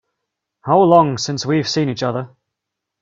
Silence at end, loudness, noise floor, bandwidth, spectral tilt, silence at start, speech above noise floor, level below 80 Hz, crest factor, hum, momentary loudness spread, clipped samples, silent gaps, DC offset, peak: 0.75 s; -16 LUFS; -80 dBFS; 7.8 kHz; -5.5 dB/octave; 0.65 s; 65 dB; -58 dBFS; 18 dB; none; 16 LU; under 0.1%; none; under 0.1%; 0 dBFS